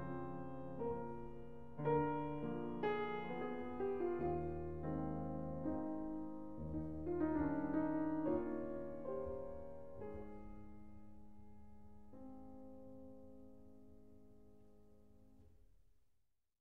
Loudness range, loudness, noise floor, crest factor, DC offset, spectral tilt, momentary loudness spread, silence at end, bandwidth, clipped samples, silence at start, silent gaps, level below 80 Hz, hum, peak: 18 LU; -43 LUFS; -82 dBFS; 18 dB; 0.2%; -10 dB/octave; 22 LU; 0 s; 4.5 kHz; under 0.1%; 0 s; none; -62 dBFS; none; -26 dBFS